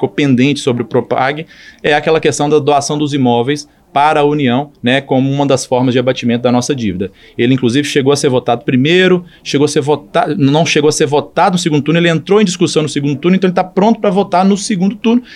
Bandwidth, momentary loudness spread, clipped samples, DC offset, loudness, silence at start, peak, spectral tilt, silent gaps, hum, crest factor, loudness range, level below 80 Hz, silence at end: 12.5 kHz; 5 LU; under 0.1%; under 0.1%; -12 LUFS; 0 s; 0 dBFS; -5.5 dB/octave; none; none; 12 dB; 2 LU; -52 dBFS; 0 s